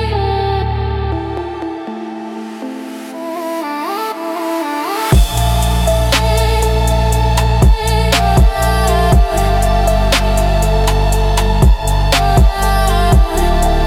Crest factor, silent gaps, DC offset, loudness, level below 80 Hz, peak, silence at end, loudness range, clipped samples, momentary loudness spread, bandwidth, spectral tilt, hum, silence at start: 12 dB; none; under 0.1%; -14 LUFS; -16 dBFS; 0 dBFS; 0 s; 9 LU; under 0.1%; 12 LU; 16.5 kHz; -5 dB/octave; none; 0 s